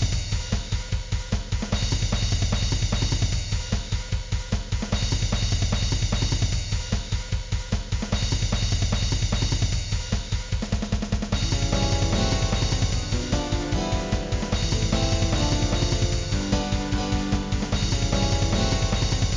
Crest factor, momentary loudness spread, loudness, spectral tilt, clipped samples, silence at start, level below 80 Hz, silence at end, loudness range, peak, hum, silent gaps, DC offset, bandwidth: 16 dB; 6 LU; -25 LUFS; -4.5 dB/octave; under 0.1%; 0 s; -28 dBFS; 0 s; 2 LU; -8 dBFS; none; none; under 0.1%; 7.6 kHz